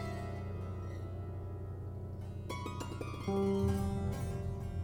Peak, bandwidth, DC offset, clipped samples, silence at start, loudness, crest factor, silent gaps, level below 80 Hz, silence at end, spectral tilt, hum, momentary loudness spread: -22 dBFS; 18 kHz; under 0.1%; under 0.1%; 0 s; -39 LUFS; 16 dB; none; -50 dBFS; 0 s; -7.5 dB/octave; none; 11 LU